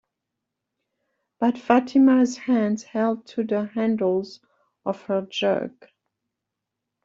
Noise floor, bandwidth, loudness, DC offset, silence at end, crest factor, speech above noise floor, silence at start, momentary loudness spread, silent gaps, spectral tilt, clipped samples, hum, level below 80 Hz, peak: -84 dBFS; 7.6 kHz; -23 LUFS; under 0.1%; 1.35 s; 20 dB; 62 dB; 1.4 s; 13 LU; none; -6 dB/octave; under 0.1%; none; -70 dBFS; -4 dBFS